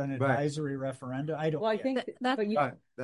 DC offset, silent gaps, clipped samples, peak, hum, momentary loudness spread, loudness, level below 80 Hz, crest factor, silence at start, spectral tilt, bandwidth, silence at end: under 0.1%; none; under 0.1%; -14 dBFS; none; 7 LU; -31 LUFS; -72 dBFS; 18 dB; 0 s; -6.5 dB/octave; 11.5 kHz; 0 s